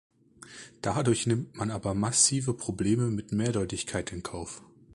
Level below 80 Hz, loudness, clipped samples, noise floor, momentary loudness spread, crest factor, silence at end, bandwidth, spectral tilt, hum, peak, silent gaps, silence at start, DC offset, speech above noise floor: -54 dBFS; -28 LUFS; under 0.1%; -50 dBFS; 18 LU; 20 dB; 0.35 s; 11.5 kHz; -4.5 dB/octave; none; -10 dBFS; none; 0.4 s; under 0.1%; 22 dB